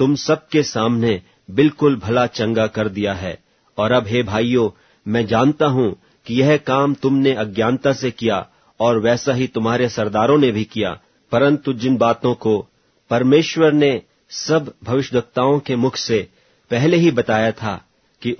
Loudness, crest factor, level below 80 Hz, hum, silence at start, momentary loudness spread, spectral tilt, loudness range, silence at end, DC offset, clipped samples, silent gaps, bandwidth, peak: -18 LUFS; 16 dB; -52 dBFS; none; 0 s; 10 LU; -6 dB/octave; 2 LU; 0.05 s; under 0.1%; under 0.1%; none; 6.6 kHz; -2 dBFS